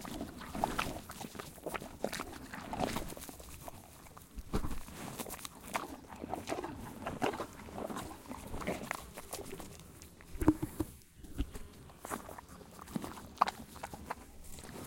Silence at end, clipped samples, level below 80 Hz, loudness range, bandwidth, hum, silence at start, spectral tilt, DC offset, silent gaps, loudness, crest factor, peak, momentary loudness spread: 0 s; under 0.1%; -52 dBFS; 3 LU; 17 kHz; none; 0 s; -4.5 dB/octave; under 0.1%; none; -41 LUFS; 32 dB; -8 dBFS; 16 LU